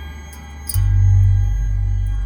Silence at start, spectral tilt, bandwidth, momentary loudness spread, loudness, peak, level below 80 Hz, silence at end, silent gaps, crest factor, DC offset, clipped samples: 0 s; -5.5 dB/octave; over 20 kHz; 20 LU; -18 LUFS; -6 dBFS; -20 dBFS; 0 s; none; 12 dB; under 0.1%; under 0.1%